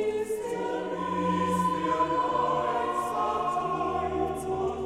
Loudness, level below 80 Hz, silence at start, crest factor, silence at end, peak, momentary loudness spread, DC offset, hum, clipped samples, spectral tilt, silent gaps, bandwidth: -28 LUFS; -52 dBFS; 0 s; 14 dB; 0 s; -14 dBFS; 5 LU; under 0.1%; none; under 0.1%; -6 dB/octave; none; 15.5 kHz